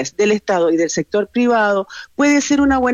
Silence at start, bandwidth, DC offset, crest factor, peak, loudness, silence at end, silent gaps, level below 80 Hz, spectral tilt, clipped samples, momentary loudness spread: 0 s; 8 kHz; under 0.1%; 10 dB; -6 dBFS; -16 LUFS; 0 s; none; -44 dBFS; -4 dB/octave; under 0.1%; 5 LU